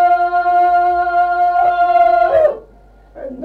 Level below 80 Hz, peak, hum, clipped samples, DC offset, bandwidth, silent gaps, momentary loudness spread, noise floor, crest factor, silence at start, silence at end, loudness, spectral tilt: -46 dBFS; -2 dBFS; none; under 0.1%; under 0.1%; 4.6 kHz; none; 10 LU; -44 dBFS; 10 dB; 0 s; 0 s; -13 LUFS; -6 dB/octave